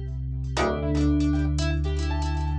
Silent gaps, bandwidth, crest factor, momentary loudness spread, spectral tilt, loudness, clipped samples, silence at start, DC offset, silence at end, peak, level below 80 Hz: none; 9.2 kHz; 14 dB; 6 LU; -6.5 dB/octave; -26 LUFS; under 0.1%; 0 s; under 0.1%; 0 s; -10 dBFS; -28 dBFS